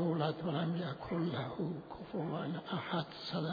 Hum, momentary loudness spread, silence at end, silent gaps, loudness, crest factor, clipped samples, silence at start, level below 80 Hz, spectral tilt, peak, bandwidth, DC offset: none; 5 LU; 0 s; none; -39 LUFS; 18 dB; under 0.1%; 0 s; -68 dBFS; -5.5 dB/octave; -18 dBFS; 5 kHz; under 0.1%